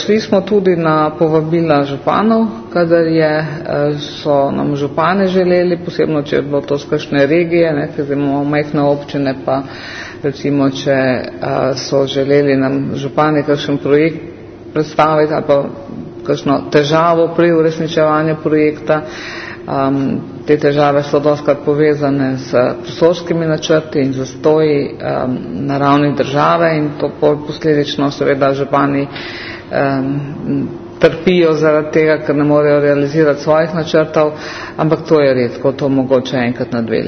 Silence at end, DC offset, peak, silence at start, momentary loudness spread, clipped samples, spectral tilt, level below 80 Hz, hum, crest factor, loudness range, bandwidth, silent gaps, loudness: 0 s; under 0.1%; 0 dBFS; 0 s; 8 LU; under 0.1%; -7 dB/octave; -48 dBFS; none; 14 dB; 3 LU; 6.6 kHz; none; -14 LUFS